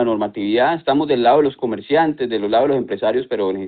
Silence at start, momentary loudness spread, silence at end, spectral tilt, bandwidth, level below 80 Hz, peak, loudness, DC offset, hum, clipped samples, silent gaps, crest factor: 0 s; 6 LU; 0 s; -4 dB/octave; 4.7 kHz; -56 dBFS; -4 dBFS; -18 LUFS; under 0.1%; none; under 0.1%; none; 14 dB